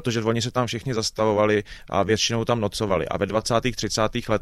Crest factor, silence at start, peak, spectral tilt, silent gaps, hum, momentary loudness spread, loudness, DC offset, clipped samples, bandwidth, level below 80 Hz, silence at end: 18 dB; 0 s; -6 dBFS; -4.5 dB/octave; none; none; 5 LU; -23 LUFS; under 0.1%; under 0.1%; 14 kHz; -46 dBFS; 0 s